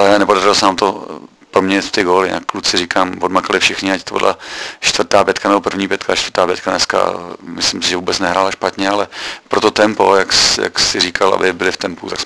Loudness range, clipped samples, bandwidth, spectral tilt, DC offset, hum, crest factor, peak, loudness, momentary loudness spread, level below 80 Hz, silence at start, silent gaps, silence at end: 3 LU; 0.2%; 11 kHz; -2.5 dB/octave; under 0.1%; none; 14 dB; 0 dBFS; -14 LUFS; 8 LU; -46 dBFS; 0 s; none; 0 s